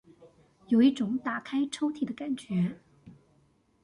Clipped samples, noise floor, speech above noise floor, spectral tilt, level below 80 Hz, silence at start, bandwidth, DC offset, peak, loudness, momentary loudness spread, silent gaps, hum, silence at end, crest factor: under 0.1%; -67 dBFS; 39 dB; -6.5 dB/octave; -70 dBFS; 0.2 s; 11 kHz; under 0.1%; -14 dBFS; -29 LUFS; 11 LU; none; none; 0.75 s; 18 dB